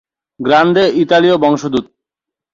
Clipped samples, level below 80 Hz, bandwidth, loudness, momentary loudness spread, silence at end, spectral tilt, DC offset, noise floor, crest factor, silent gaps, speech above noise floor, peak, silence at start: under 0.1%; -54 dBFS; 7.6 kHz; -12 LUFS; 10 LU; 0.7 s; -6 dB/octave; under 0.1%; -84 dBFS; 12 dB; none; 73 dB; 0 dBFS; 0.4 s